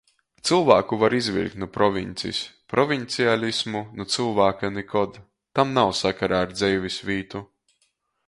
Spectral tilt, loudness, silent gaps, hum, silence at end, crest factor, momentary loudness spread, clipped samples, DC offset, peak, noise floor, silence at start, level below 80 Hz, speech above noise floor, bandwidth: -4.5 dB/octave; -23 LUFS; none; none; 0.85 s; 22 dB; 10 LU; under 0.1%; under 0.1%; 0 dBFS; -70 dBFS; 0.45 s; -54 dBFS; 48 dB; 11.5 kHz